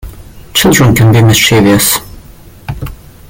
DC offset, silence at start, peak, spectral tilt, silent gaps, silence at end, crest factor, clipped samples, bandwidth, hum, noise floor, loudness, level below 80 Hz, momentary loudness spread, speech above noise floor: under 0.1%; 0.05 s; 0 dBFS; -4.5 dB/octave; none; 0.35 s; 10 dB; under 0.1%; 17.5 kHz; none; -34 dBFS; -7 LUFS; -30 dBFS; 19 LU; 28 dB